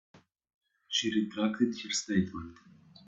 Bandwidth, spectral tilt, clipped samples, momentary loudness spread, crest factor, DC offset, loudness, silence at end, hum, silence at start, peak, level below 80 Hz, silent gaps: 8.4 kHz; -4 dB/octave; under 0.1%; 10 LU; 20 dB; under 0.1%; -31 LUFS; 0.55 s; none; 0.15 s; -14 dBFS; -68 dBFS; 0.54-0.61 s